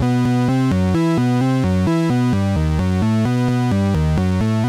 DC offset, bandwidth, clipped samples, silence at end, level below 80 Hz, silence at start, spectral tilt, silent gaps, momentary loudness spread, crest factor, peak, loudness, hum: under 0.1%; 14 kHz; under 0.1%; 0 s; -32 dBFS; 0 s; -7.5 dB/octave; none; 1 LU; 6 dB; -10 dBFS; -17 LUFS; none